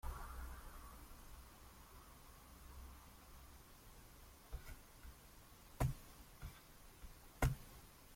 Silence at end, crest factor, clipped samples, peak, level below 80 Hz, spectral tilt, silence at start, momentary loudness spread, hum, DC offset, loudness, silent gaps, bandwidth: 0 s; 26 dB; under 0.1%; -24 dBFS; -54 dBFS; -5.5 dB/octave; 0.05 s; 18 LU; none; under 0.1%; -52 LUFS; none; 16.5 kHz